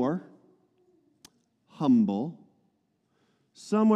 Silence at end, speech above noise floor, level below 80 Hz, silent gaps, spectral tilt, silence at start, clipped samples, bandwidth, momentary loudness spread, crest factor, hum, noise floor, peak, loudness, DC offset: 0 s; 49 dB; -80 dBFS; none; -8 dB/octave; 0 s; under 0.1%; 9.6 kHz; 14 LU; 18 dB; none; -73 dBFS; -12 dBFS; -27 LUFS; under 0.1%